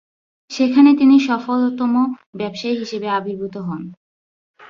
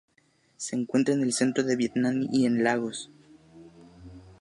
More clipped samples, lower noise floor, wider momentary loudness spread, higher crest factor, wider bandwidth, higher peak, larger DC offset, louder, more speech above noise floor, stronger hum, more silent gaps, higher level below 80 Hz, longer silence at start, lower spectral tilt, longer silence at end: neither; first, under -90 dBFS vs -66 dBFS; first, 16 LU vs 12 LU; about the same, 16 dB vs 18 dB; second, 7.2 kHz vs 11.5 kHz; first, -2 dBFS vs -10 dBFS; neither; first, -17 LUFS vs -26 LUFS; first, over 74 dB vs 41 dB; neither; first, 2.26-2.33 s, 3.97-4.54 s vs none; about the same, -64 dBFS vs -64 dBFS; about the same, 0.5 s vs 0.6 s; about the same, -6 dB/octave vs -5 dB/octave; about the same, 0.05 s vs 0.1 s